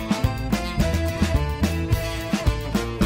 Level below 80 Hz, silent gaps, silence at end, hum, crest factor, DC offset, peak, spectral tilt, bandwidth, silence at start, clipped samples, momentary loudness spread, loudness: -28 dBFS; none; 0 s; none; 16 dB; under 0.1%; -6 dBFS; -6 dB/octave; 16.5 kHz; 0 s; under 0.1%; 3 LU; -24 LUFS